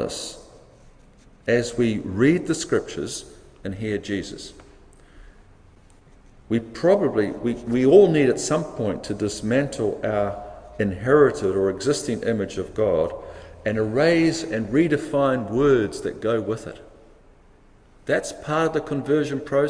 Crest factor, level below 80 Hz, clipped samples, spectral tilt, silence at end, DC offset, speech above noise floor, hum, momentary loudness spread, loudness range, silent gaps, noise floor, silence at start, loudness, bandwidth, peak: 20 dB; -48 dBFS; under 0.1%; -5.5 dB/octave; 0 s; under 0.1%; 31 dB; none; 14 LU; 8 LU; none; -52 dBFS; 0 s; -22 LUFS; 10.5 kHz; -2 dBFS